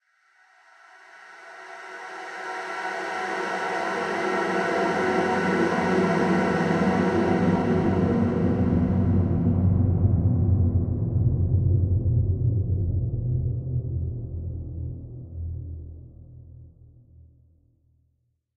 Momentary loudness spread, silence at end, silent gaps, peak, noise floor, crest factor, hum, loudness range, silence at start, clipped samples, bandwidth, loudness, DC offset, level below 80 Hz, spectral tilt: 14 LU; 1.9 s; none; -10 dBFS; -71 dBFS; 16 dB; none; 14 LU; 1.15 s; under 0.1%; 9.4 kHz; -24 LUFS; under 0.1%; -38 dBFS; -8 dB/octave